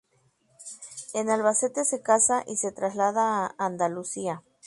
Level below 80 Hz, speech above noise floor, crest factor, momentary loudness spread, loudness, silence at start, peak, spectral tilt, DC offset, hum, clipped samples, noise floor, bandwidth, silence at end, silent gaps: -72 dBFS; 41 dB; 20 dB; 18 LU; -26 LUFS; 0.6 s; -8 dBFS; -3.5 dB/octave; under 0.1%; none; under 0.1%; -67 dBFS; 11.5 kHz; 0 s; none